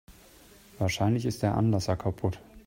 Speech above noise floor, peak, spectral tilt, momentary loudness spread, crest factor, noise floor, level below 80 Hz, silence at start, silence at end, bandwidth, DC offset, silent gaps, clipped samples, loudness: 27 dB; -12 dBFS; -6.5 dB/octave; 6 LU; 18 dB; -55 dBFS; -52 dBFS; 0.1 s; 0.05 s; 16.5 kHz; under 0.1%; none; under 0.1%; -29 LUFS